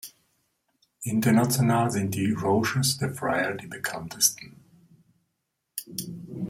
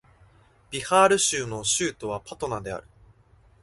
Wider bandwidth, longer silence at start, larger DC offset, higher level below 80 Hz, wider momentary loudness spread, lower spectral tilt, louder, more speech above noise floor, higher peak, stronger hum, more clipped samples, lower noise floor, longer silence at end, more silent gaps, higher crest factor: first, 16 kHz vs 12 kHz; second, 0.05 s vs 0.7 s; neither; second, -62 dBFS vs -56 dBFS; about the same, 16 LU vs 16 LU; first, -4.5 dB/octave vs -2.5 dB/octave; about the same, -25 LUFS vs -24 LUFS; first, 54 dB vs 33 dB; about the same, -6 dBFS vs -4 dBFS; neither; neither; first, -80 dBFS vs -58 dBFS; second, 0 s vs 0.85 s; neither; about the same, 22 dB vs 22 dB